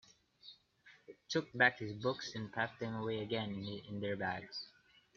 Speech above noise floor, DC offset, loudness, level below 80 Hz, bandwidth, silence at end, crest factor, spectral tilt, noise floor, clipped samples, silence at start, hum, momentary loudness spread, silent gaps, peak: 27 dB; under 0.1%; -38 LUFS; -74 dBFS; 7.4 kHz; 0.5 s; 26 dB; -3 dB/octave; -66 dBFS; under 0.1%; 0.45 s; none; 25 LU; none; -14 dBFS